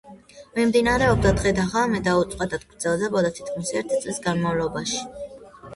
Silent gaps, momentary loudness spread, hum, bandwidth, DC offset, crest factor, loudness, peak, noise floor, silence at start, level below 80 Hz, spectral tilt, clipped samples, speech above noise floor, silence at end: none; 10 LU; none; 11.5 kHz; under 0.1%; 16 dB; -23 LUFS; -6 dBFS; -46 dBFS; 0.05 s; -40 dBFS; -5 dB/octave; under 0.1%; 23 dB; 0 s